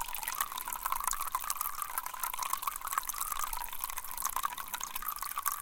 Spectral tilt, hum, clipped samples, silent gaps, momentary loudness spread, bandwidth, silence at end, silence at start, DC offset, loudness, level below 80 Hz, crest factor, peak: 1.5 dB/octave; none; under 0.1%; none; 3 LU; 17 kHz; 0 s; 0 s; under 0.1%; -35 LUFS; -52 dBFS; 28 dB; -8 dBFS